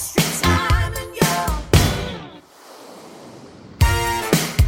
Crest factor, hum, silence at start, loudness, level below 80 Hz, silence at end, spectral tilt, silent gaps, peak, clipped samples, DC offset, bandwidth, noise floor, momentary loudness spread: 20 dB; none; 0 s; -19 LUFS; -26 dBFS; 0 s; -4.5 dB/octave; none; 0 dBFS; under 0.1%; under 0.1%; 17 kHz; -43 dBFS; 23 LU